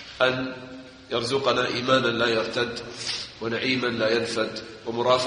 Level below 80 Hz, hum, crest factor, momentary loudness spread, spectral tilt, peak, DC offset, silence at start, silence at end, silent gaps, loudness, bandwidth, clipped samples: -58 dBFS; none; 20 dB; 11 LU; -4 dB/octave; -6 dBFS; under 0.1%; 0 s; 0 s; none; -25 LUFS; 10 kHz; under 0.1%